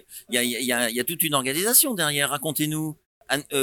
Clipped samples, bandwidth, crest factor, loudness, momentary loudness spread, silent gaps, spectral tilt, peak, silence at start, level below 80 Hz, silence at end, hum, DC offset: under 0.1%; 19 kHz; 20 dB; -22 LUFS; 10 LU; 3.06-3.21 s; -2 dB/octave; -4 dBFS; 0.1 s; -66 dBFS; 0 s; none; under 0.1%